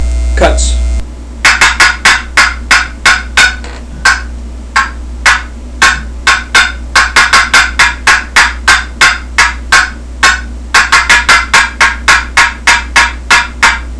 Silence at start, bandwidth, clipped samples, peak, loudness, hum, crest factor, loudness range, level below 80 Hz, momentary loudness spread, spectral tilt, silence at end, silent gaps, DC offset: 0 s; 11 kHz; 3%; 0 dBFS; -7 LUFS; none; 8 dB; 3 LU; -18 dBFS; 9 LU; -1.5 dB/octave; 0 s; none; 0.6%